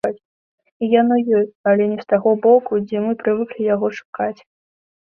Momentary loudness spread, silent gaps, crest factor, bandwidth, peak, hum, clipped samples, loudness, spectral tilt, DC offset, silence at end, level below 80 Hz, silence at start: 11 LU; 0.25-0.58 s, 0.72-0.80 s, 1.55-1.64 s, 4.05-4.13 s; 16 dB; 6.4 kHz; -2 dBFS; none; under 0.1%; -18 LUFS; -8 dB/octave; under 0.1%; 0.75 s; -64 dBFS; 0.05 s